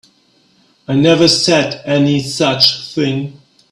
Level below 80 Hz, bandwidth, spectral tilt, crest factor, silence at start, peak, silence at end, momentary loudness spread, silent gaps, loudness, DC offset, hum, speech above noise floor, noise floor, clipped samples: -52 dBFS; 15.5 kHz; -4.5 dB/octave; 14 dB; 0.9 s; 0 dBFS; 0.4 s; 9 LU; none; -13 LUFS; under 0.1%; none; 41 dB; -54 dBFS; under 0.1%